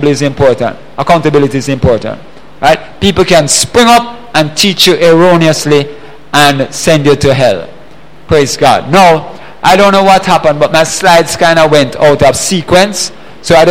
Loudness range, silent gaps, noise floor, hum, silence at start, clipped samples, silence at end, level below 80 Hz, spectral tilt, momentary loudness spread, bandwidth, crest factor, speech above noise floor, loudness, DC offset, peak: 3 LU; none; -36 dBFS; none; 0 s; 0.9%; 0 s; -34 dBFS; -4 dB/octave; 8 LU; 17 kHz; 8 dB; 29 dB; -7 LUFS; 4%; 0 dBFS